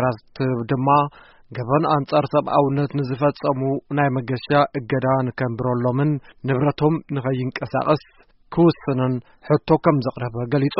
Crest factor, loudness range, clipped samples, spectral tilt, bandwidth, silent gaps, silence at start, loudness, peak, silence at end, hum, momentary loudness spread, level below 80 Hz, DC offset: 18 dB; 1 LU; under 0.1%; -7 dB/octave; 5.8 kHz; none; 0 s; -21 LUFS; -2 dBFS; 0 s; none; 7 LU; -52 dBFS; under 0.1%